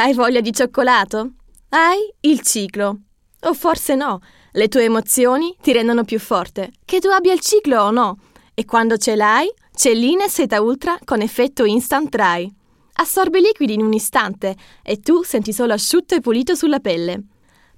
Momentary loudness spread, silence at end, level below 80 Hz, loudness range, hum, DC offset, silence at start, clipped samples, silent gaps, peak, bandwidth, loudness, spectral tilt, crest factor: 11 LU; 0.55 s; -52 dBFS; 2 LU; none; under 0.1%; 0 s; under 0.1%; none; -2 dBFS; 16.5 kHz; -17 LUFS; -3 dB/octave; 16 dB